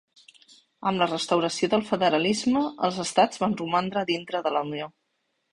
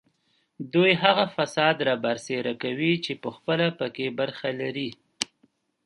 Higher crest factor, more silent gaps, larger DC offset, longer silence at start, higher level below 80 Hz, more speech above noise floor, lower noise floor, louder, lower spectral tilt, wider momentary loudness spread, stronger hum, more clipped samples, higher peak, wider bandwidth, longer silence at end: about the same, 20 dB vs 24 dB; neither; neither; first, 0.8 s vs 0.6 s; first, -64 dBFS vs -72 dBFS; first, 51 dB vs 45 dB; first, -75 dBFS vs -70 dBFS; about the same, -25 LUFS vs -25 LUFS; about the same, -4.5 dB/octave vs -4.5 dB/octave; second, 6 LU vs 12 LU; neither; neither; second, -6 dBFS vs -2 dBFS; about the same, 11.5 kHz vs 11.5 kHz; about the same, 0.65 s vs 0.6 s